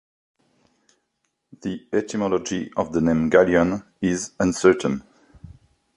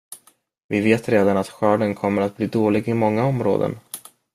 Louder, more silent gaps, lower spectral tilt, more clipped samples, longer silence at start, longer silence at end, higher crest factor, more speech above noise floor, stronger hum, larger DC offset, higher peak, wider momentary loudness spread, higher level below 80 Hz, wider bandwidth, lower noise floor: about the same, -22 LUFS vs -20 LUFS; second, none vs 0.64-0.69 s; second, -5.5 dB/octave vs -7 dB/octave; neither; first, 1.65 s vs 0.1 s; first, 0.5 s vs 0.35 s; about the same, 20 dB vs 18 dB; first, 54 dB vs 36 dB; neither; neither; about the same, -4 dBFS vs -2 dBFS; second, 12 LU vs 16 LU; first, -50 dBFS vs -58 dBFS; second, 11.5 kHz vs 15.5 kHz; first, -75 dBFS vs -55 dBFS